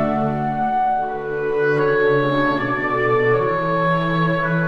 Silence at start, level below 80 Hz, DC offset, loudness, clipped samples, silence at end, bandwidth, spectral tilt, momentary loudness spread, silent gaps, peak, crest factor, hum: 0 s; -44 dBFS; 0.3%; -19 LUFS; under 0.1%; 0 s; 6.8 kHz; -8.5 dB/octave; 4 LU; none; -6 dBFS; 12 dB; none